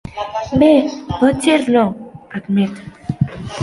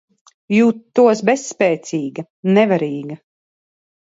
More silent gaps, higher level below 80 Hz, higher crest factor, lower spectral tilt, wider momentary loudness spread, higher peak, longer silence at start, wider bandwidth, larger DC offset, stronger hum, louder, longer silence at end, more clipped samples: second, none vs 2.30-2.43 s; first, -42 dBFS vs -66 dBFS; about the same, 16 dB vs 16 dB; about the same, -6.5 dB/octave vs -6 dB/octave; first, 17 LU vs 14 LU; about the same, -2 dBFS vs 0 dBFS; second, 0.05 s vs 0.5 s; first, 11.5 kHz vs 8 kHz; neither; neither; about the same, -16 LUFS vs -17 LUFS; second, 0 s vs 0.9 s; neither